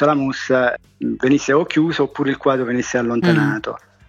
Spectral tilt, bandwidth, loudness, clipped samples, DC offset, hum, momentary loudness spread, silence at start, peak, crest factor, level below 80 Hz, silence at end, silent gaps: -6 dB/octave; 9 kHz; -18 LUFS; under 0.1%; under 0.1%; none; 7 LU; 0 s; -2 dBFS; 16 dB; -54 dBFS; 0.3 s; none